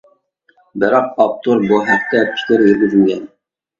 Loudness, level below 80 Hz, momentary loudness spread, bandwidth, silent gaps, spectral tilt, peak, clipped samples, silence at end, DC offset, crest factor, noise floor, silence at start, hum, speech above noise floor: -14 LUFS; -56 dBFS; 6 LU; 7.4 kHz; none; -6.5 dB/octave; 0 dBFS; under 0.1%; 0.55 s; under 0.1%; 14 dB; -57 dBFS; 0.75 s; none; 43 dB